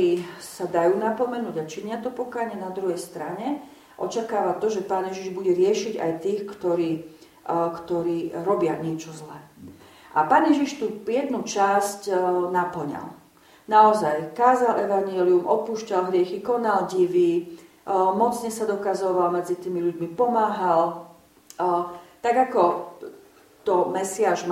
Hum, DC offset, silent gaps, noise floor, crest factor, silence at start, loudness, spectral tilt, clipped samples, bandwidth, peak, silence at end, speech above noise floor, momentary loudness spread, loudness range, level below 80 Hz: none; under 0.1%; none; -51 dBFS; 20 dB; 0 s; -24 LUFS; -5.5 dB/octave; under 0.1%; 15.5 kHz; -4 dBFS; 0 s; 28 dB; 12 LU; 6 LU; -68 dBFS